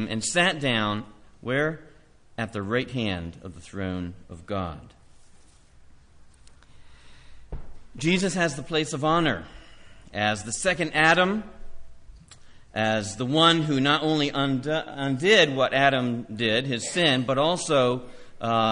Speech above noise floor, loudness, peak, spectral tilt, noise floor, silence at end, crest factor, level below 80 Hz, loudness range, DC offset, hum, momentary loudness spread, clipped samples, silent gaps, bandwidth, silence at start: 28 dB; -24 LUFS; -6 dBFS; -4 dB/octave; -52 dBFS; 0 s; 20 dB; -50 dBFS; 15 LU; under 0.1%; none; 18 LU; under 0.1%; none; 10.5 kHz; 0 s